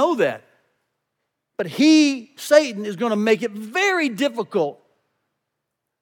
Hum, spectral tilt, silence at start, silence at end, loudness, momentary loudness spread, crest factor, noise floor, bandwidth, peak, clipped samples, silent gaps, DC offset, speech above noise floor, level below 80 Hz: none; -4 dB/octave; 0 s; 1.3 s; -20 LUFS; 14 LU; 20 dB; -80 dBFS; 17.5 kHz; -2 dBFS; under 0.1%; none; under 0.1%; 60 dB; -88 dBFS